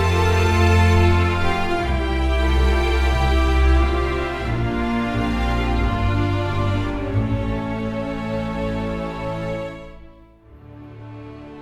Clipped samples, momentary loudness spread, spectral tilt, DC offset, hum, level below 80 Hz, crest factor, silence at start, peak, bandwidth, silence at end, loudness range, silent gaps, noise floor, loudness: under 0.1%; 11 LU; -6.5 dB/octave; under 0.1%; none; -24 dBFS; 16 dB; 0 s; -4 dBFS; 13 kHz; 0 s; 9 LU; none; -46 dBFS; -21 LUFS